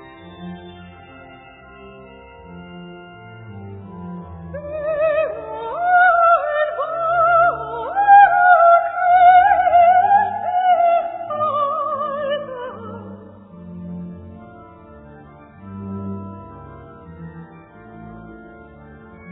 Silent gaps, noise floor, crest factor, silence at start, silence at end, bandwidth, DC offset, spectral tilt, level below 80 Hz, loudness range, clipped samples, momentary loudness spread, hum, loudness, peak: none; -42 dBFS; 18 dB; 0 s; 0 s; 4 kHz; under 0.1%; -9 dB/octave; -52 dBFS; 23 LU; under 0.1%; 27 LU; none; -15 LUFS; 0 dBFS